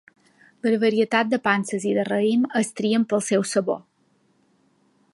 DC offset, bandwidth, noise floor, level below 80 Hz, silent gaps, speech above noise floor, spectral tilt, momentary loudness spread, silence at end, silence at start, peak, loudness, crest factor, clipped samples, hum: under 0.1%; 11.5 kHz; -64 dBFS; -72 dBFS; none; 43 dB; -4.5 dB/octave; 4 LU; 1.35 s; 0.65 s; -4 dBFS; -22 LUFS; 20 dB; under 0.1%; none